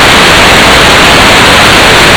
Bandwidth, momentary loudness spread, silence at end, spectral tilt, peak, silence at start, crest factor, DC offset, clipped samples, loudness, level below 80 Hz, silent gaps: over 20 kHz; 0 LU; 0 s; -2.5 dB/octave; 0 dBFS; 0 s; 2 dB; under 0.1%; 40%; -1 LUFS; -18 dBFS; none